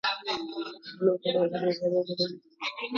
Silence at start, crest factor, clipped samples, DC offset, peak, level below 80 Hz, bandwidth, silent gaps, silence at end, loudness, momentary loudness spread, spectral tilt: 0.05 s; 18 dB; under 0.1%; under 0.1%; -12 dBFS; -76 dBFS; 7.2 kHz; none; 0 s; -30 LUFS; 9 LU; -5.5 dB/octave